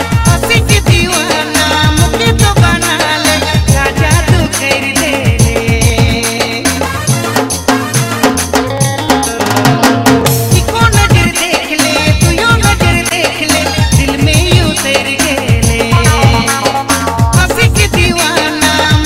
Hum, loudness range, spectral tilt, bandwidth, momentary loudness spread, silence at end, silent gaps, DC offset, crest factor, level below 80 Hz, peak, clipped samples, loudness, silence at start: none; 2 LU; -4 dB/octave; 16.5 kHz; 4 LU; 0 s; none; under 0.1%; 10 dB; -20 dBFS; 0 dBFS; 0.2%; -9 LUFS; 0 s